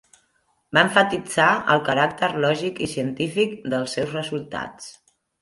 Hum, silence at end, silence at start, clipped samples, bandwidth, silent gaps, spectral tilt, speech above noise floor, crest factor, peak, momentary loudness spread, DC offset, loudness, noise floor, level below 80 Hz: none; 0.5 s; 0.7 s; under 0.1%; 11.5 kHz; none; -4.5 dB/octave; 45 dB; 22 dB; -2 dBFS; 13 LU; under 0.1%; -22 LUFS; -67 dBFS; -60 dBFS